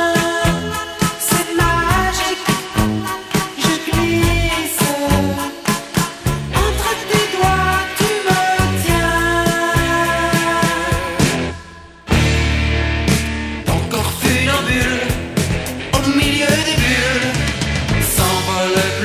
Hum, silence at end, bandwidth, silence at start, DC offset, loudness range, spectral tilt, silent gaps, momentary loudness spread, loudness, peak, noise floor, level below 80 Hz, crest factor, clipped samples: none; 0 s; 16 kHz; 0 s; under 0.1%; 2 LU; -4 dB/octave; none; 6 LU; -16 LUFS; 0 dBFS; -37 dBFS; -26 dBFS; 16 dB; under 0.1%